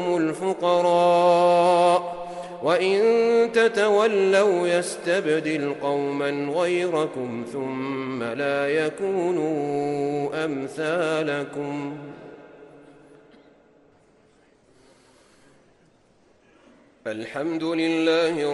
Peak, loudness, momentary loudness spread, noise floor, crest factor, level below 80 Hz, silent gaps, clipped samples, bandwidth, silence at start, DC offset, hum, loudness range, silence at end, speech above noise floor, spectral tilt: -8 dBFS; -22 LUFS; 13 LU; -59 dBFS; 16 dB; -70 dBFS; none; under 0.1%; 11.5 kHz; 0 s; under 0.1%; none; 14 LU; 0 s; 37 dB; -5 dB/octave